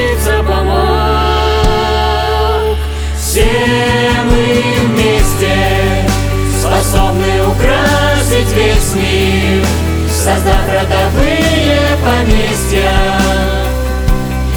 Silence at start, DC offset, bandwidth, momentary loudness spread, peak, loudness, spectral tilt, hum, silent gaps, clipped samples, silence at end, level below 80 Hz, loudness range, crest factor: 0 s; under 0.1%; over 20 kHz; 4 LU; 0 dBFS; -12 LUFS; -5 dB/octave; none; none; under 0.1%; 0 s; -16 dBFS; 1 LU; 10 dB